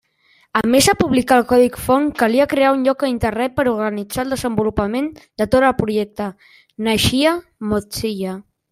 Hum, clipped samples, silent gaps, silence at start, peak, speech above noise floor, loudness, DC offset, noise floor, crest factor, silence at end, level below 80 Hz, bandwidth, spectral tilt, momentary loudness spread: none; under 0.1%; none; 0.55 s; 0 dBFS; 40 dB; -17 LUFS; under 0.1%; -57 dBFS; 18 dB; 0.3 s; -42 dBFS; 16 kHz; -4.5 dB/octave; 11 LU